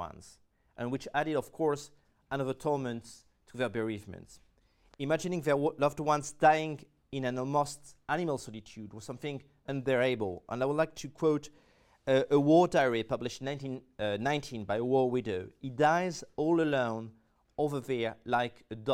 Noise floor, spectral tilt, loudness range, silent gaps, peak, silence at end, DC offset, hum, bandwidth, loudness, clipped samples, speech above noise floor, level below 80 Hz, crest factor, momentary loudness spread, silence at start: -66 dBFS; -6 dB/octave; 6 LU; none; -12 dBFS; 0 s; under 0.1%; none; 16 kHz; -32 LUFS; under 0.1%; 34 dB; -64 dBFS; 20 dB; 16 LU; 0 s